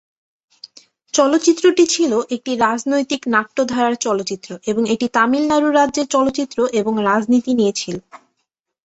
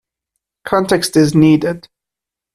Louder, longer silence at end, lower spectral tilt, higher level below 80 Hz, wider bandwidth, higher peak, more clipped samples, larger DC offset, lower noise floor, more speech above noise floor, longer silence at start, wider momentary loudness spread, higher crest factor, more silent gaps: second, -17 LUFS vs -13 LUFS; about the same, 0.7 s vs 0.75 s; second, -3.5 dB/octave vs -6 dB/octave; second, -58 dBFS vs -50 dBFS; second, 8.2 kHz vs 13.5 kHz; about the same, -2 dBFS vs 0 dBFS; neither; neither; second, -74 dBFS vs -85 dBFS; second, 58 dB vs 73 dB; first, 1.15 s vs 0.65 s; second, 8 LU vs 16 LU; about the same, 16 dB vs 16 dB; neither